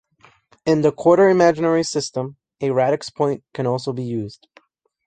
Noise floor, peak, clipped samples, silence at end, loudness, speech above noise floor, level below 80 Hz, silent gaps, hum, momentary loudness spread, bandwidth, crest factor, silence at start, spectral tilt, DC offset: -56 dBFS; -2 dBFS; under 0.1%; 0.75 s; -19 LUFS; 37 dB; -60 dBFS; none; none; 14 LU; 9.4 kHz; 18 dB; 0.65 s; -6 dB/octave; under 0.1%